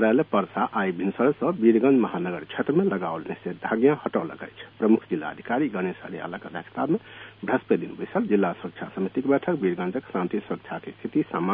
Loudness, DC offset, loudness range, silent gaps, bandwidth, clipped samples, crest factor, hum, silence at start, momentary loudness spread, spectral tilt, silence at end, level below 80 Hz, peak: -25 LUFS; under 0.1%; 4 LU; none; 4.2 kHz; under 0.1%; 18 dB; none; 0 s; 13 LU; -11 dB/octave; 0 s; -66 dBFS; -6 dBFS